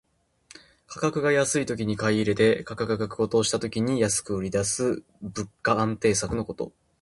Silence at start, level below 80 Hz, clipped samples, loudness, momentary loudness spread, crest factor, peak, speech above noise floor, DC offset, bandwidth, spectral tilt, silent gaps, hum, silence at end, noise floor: 0.9 s; -52 dBFS; under 0.1%; -25 LUFS; 12 LU; 18 dB; -8 dBFS; 31 dB; under 0.1%; 11.5 kHz; -4.5 dB/octave; none; none; 0.3 s; -56 dBFS